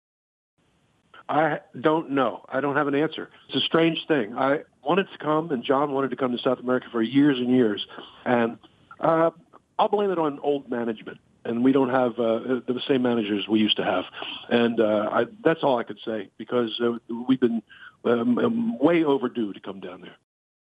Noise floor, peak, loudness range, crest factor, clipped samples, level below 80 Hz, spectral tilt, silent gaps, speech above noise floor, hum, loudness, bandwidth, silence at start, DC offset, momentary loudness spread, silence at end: -65 dBFS; -6 dBFS; 2 LU; 18 dB; under 0.1%; -76 dBFS; -8 dB/octave; none; 42 dB; none; -24 LUFS; 8 kHz; 1.15 s; under 0.1%; 11 LU; 0.6 s